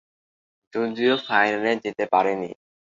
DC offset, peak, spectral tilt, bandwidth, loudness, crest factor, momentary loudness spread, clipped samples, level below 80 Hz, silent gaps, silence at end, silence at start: under 0.1%; -4 dBFS; -5 dB/octave; 7.6 kHz; -23 LUFS; 20 dB; 10 LU; under 0.1%; -70 dBFS; none; 0.45 s; 0.75 s